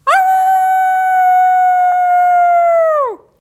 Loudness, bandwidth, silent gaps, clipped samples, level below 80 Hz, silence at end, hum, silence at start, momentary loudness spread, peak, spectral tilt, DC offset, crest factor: -11 LUFS; 14.5 kHz; none; under 0.1%; -60 dBFS; 0.25 s; none; 0.05 s; 2 LU; 0 dBFS; -1 dB/octave; under 0.1%; 10 dB